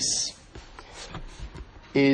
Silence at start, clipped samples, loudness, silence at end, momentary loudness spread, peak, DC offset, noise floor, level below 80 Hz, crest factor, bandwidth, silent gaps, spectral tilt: 0 s; under 0.1%; -29 LUFS; 0 s; 21 LU; -10 dBFS; under 0.1%; -46 dBFS; -46 dBFS; 18 dB; 10 kHz; none; -3 dB/octave